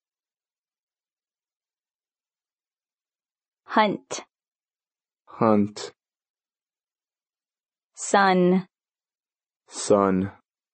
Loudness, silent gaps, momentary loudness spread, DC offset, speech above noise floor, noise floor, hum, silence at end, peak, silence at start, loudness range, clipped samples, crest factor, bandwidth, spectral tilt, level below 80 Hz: -22 LUFS; 6.30-6.34 s, 7.86-7.90 s; 17 LU; under 0.1%; over 69 dB; under -90 dBFS; none; 0.4 s; -6 dBFS; 3.7 s; 7 LU; under 0.1%; 22 dB; 8.4 kHz; -5 dB/octave; -72 dBFS